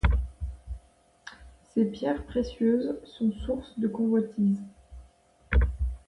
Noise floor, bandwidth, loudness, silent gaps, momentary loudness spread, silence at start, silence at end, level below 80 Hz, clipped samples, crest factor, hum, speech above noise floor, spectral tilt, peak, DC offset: -59 dBFS; 10.5 kHz; -29 LUFS; none; 19 LU; 0.05 s; 0.1 s; -34 dBFS; under 0.1%; 20 dB; none; 31 dB; -8.5 dB/octave; -10 dBFS; under 0.1%